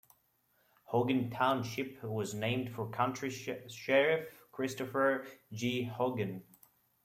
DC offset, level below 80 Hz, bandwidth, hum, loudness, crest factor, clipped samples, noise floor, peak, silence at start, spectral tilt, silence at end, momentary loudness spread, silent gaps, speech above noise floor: under 0.1%; -74 dBFS; 16 kHz; none; -34 LUFS; 20 dB; under 0.1%; -74 dBFS; -16 dBFS; 0.9 s; -5.5 dB/octave; 0.6 s; 10 LU; none; 40 dB